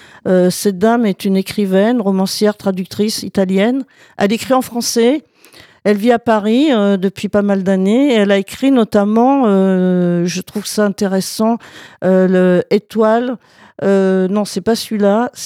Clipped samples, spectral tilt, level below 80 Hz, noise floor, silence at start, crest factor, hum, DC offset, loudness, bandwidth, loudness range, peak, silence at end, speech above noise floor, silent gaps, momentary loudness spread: under 0.1%; -6 dB/octave; -58 dBFS; -43 dBFS; 0.25 s; 12 dB; none; under 0.1%; -14 LUFS; 15.5 kHz; 3 LU; -2 dBFS; 0 s; 30 dB; none; 7 LU